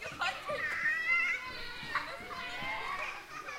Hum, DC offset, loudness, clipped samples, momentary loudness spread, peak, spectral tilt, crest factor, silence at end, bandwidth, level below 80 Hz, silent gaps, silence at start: none; under 0.1%; -34 LUFS; under 0.1%; 12 LU; -20 dBFS; -2 dB/octave; 16 dB; 0 s; 16 kHz; -58 dBFS; none; 0 s